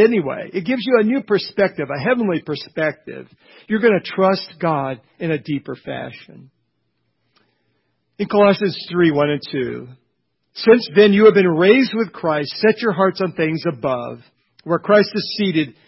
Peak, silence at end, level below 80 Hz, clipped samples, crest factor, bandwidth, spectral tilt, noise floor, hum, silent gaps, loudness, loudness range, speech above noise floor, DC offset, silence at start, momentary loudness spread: 0 dBFS; 0.15 s; -60 dBFS; under 0.1%; 18 dB; 5.8 kHz; -10 dB/octave; -71 dBFS; none; none; -17 LUFS; 8 LU; 53 dB; under 0.1%; 0 s; 15 LU